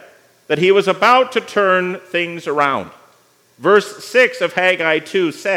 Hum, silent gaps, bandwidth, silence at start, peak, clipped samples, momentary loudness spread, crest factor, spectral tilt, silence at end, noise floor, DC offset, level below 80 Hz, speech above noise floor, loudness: none; none; 15.5 kHz; 0.5 s; 0 dBFS; under 0.1%; 8 LU; 16 dB; -4.5 dB/octave; 0 s; -54 dBFS; under 0.1%; -74 dBFS; 38 dB; -15 LUFS